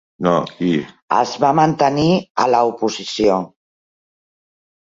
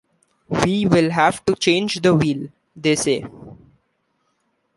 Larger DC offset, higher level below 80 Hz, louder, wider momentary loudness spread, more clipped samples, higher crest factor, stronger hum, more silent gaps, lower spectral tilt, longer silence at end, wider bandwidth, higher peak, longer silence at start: neither; about the same, -52 dBFS vs -50 dBFS; about the same, -17 LUFS vs -19 LUFS; second, 7 LU vs 10 LU; neither; about the same, 18 dB vs 20 dB; neither; first, 1.02-1.08 s, 2.30-2.35 s vs none; about the same, -6 dB/octave vs -5 dB/octave; first, 1.45 s vs 1.2 s; second, 7.8 kHz vs 11.5 kHz; about the same, -2 dBFS vs 0 dBFS; second, 0.2 s vs 0.5 s